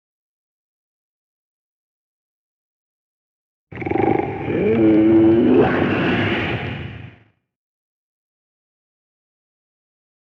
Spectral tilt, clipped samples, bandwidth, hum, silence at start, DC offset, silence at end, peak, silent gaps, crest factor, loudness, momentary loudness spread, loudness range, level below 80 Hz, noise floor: -9 dB/octave; under 0.1%; 5.2 kHz; none; 3.7 s; under 0.1%; 3.25 s; -4 dBFS; none; 18 dB; -17 LUFS; 15 LU; 14 LU; -48 dBFS; -53 dBFS